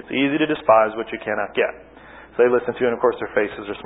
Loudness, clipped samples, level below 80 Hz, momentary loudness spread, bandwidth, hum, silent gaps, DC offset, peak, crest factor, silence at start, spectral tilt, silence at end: -20 LUFS; under 0.1%; -56 dBFS; 9 LU; 4 kHz; none; none; under 0.1%; -2 dBFS; 18 dB; 0.05 s; -10 dB/octave; 0 s